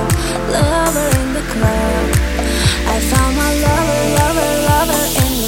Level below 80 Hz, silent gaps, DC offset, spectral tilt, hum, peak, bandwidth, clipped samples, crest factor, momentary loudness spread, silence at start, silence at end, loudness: -22 dBFS; none; under 0.1%; -4.5 dB/octave; none; 0 dBFS; 17 kHz; under 0.1%; 14 dB; 3 LU; 0 s; 0 s; -15 LUFS